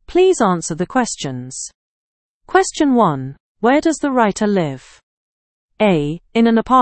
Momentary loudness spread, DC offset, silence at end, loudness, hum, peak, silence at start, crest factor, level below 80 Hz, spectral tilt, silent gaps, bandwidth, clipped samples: 13 LU; under 0.1%; 0 s; -17 LUFS; none; 0 dBFS; 0.1 s; 16 dB; -48 dBFS; -5 dB/octave; 1.75-2.41 s, 3.40-3.55 s, 5.03-5.69 s; 8.8 kHz; under 0.1%